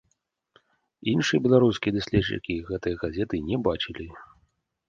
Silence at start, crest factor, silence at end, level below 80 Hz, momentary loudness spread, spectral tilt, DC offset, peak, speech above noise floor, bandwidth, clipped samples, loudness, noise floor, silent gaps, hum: 1.05 s; 22 dB; 0.65 s; -48 dBFS; 12 LU; -6 dB/octave; under 0.1%; -6 dBFS; 49 dB; 7.6 kHz; under 0.1%; -25 LUFS; -74 dBFS; none; none